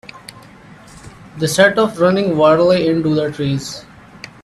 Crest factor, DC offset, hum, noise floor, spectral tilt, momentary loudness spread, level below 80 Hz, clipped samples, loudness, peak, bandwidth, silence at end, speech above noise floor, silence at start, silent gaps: 16 dB; under 0.1%; none; -41 dBFS; -5.5 dB/octave; 23 LU; -50 dBFS; under 0.1%; -14 LUFS; 0 dBFS; 13.5 kHz; 0.6 s; 27 dB; 0.15 s; none